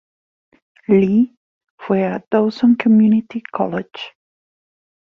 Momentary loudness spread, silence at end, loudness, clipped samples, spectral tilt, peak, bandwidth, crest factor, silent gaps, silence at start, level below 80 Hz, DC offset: 19 LU; 0.95 s; -16 LUFS; under 0.1%; -9 dB/octave; -2 dBFS; 5.6 kHz; 16 dB; 1.37-1.61 s, 1.70-1.78 s; 0.9 s; -60 dBFS; under 0.1%